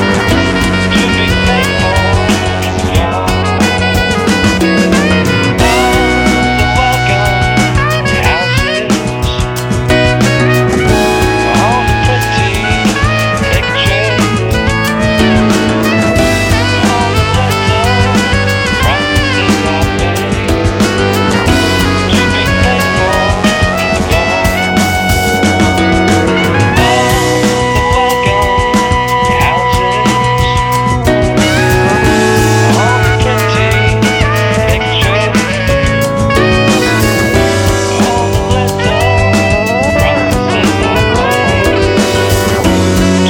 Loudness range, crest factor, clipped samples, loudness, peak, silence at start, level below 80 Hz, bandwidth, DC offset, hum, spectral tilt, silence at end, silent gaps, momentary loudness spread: 1 LU; 10 dB; under 0.1%; -10 LUFS; 0 dBFS; 0 s; -22 dBFS; 17.5 kHz; under 0.1%; none; -5 dB/octave; 0 s; none; 3 LU